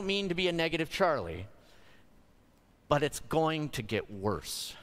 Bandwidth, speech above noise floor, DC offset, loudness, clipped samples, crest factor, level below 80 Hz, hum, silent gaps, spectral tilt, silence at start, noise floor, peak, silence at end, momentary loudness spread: 16 kHz; 32 dB; under 0.1%; -32 LUFS; under 0.1%; 22 dB; -54 dBFS; none; none; -4.5 dB/octave; 0 s; -63 dBFS; -10 dBFS; 0 s; 8 LU